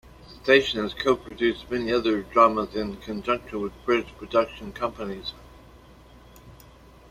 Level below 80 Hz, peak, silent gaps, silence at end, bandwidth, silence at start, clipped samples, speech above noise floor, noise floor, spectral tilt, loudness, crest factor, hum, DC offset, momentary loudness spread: -50 dBFS; -2 dBFS; none; 0.55 s; 15.5 kHz; 0.05 s; under 0.1%; 25 dB; -50 dBFS; -5 dB/octave; -25 LUFS; 24 dB; none; under 0.1%; 13 LU